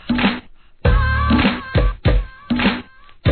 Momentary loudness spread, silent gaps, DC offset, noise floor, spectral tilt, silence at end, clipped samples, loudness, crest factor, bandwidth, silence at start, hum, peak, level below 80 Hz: 7 LU; none; 0.3%; -37 dBFS; -10 dB/octave; 0 s; under 0.1%; -19 LUFS; 16 dB; 4.5 kHz; 0.05 s; none; -2 dBFS; -22 dBFS